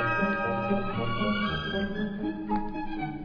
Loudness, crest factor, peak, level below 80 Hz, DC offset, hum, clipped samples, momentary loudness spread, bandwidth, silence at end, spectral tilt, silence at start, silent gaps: -30 LUFS; 16 dB; -14 dBFS; -42 dBFS; under 0.1%; none; under 0.1%; 7 LU; 5.4 kHz; 0 s; -8 dB/octave; 0 s; none